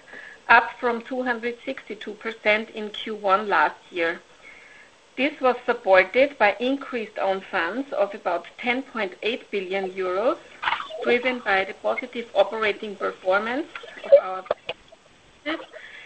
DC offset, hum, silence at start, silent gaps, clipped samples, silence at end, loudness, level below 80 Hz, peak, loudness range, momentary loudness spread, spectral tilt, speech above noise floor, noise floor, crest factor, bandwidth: under 0.1%; none; 0.1 s; none; under 0.1%; 0 s; -24 LUFS; -64 dBFS; -2 dBFS; 4 LU; 15 LU; -4.5 dB/octave; 30 dB; -54 dBFS; 24 dB; 8.4 kHz